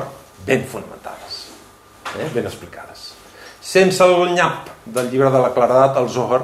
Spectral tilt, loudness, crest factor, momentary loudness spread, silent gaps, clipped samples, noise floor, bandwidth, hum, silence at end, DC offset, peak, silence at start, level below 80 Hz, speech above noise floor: -5 dB/octave; -16 LUFS; 16 dB; 21 LU; none; under 0.1%; -45 dBFS; 15 kHz; none; 0 s; under 0.1%; -2 dBFS; 0 s; -56 dBFS; 28 dB